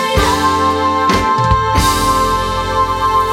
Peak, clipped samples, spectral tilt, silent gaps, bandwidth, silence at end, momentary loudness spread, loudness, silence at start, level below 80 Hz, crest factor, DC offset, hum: 0 dBFS; under 0.1%; -4.5 dB/octave; none; 18 kHz; 0 s; 3 LU; -13 LUFS; 0 s; -26 dBFS; 12 dB; under 0.1%; none